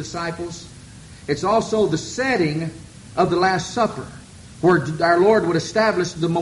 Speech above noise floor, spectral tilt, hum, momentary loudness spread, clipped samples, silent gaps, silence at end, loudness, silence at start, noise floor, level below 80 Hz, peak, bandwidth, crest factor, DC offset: 21 dB; -5.5 dB/octave; none; 17 LU; under 0.1%; none; 0 s; -20 LUFS; 0 s; -41 dBFS; -50 dBFS; -4 dBFS; 11.5 kHz; 18 dB; under 0.1%